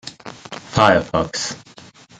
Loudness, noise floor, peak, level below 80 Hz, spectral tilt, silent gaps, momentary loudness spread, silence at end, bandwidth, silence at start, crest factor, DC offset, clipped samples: -18 LUFS; -44 dBFS; 0 dBFS; -48 dBFS; -4 dB/octave; none; 21 LU; 0.6 s; 9.6 kHz; 0.05 s; 20 dB; under 0.1%; under 0.1%